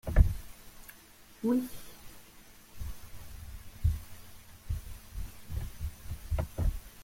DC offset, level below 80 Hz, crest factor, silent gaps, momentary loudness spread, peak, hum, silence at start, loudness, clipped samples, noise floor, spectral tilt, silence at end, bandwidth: under 0.1%; -36 dBFS; 26 dB; none; 22 LU; -8 dBFS; none; 0.05 s; -36 LUFS; under 0.1%; -55 dBFS; -7 dB/octave; 0 s; 16.5 kHz